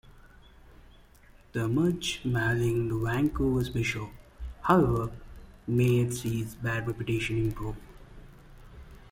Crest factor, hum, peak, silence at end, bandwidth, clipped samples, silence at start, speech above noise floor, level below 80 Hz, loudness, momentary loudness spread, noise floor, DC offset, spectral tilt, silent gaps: 22 dB; none; -8 dBFS; 0.15 s; 16 kHz; under 0.1%; 0.05 s; 28 dB; -46 dBFS; -29 LUFS; 14 LU; -55 dBFS; under 0.1%; -6.5 dB/octave; none